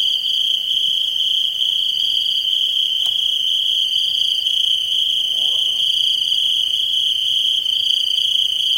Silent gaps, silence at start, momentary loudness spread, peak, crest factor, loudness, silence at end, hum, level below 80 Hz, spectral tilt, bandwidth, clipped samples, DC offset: none; 0 s; 1 LU; -4 dBFS; 14 dB; -15 LUFS; 0 s; none; -64 dBFS; 2.5 dB/octave; 16.5 kHz; under 0.1%; under 0.1%